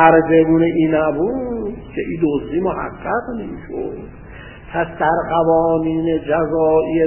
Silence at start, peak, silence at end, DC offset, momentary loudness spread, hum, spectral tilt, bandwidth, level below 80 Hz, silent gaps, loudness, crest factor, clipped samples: 0 s; 0 dBFS; 0 s; under 0.1%; 14 LU; none; -12 dB/octave; 3.2 kHz; -40 dBFS; none; -18 LUFS; 16 dB; under 0.1%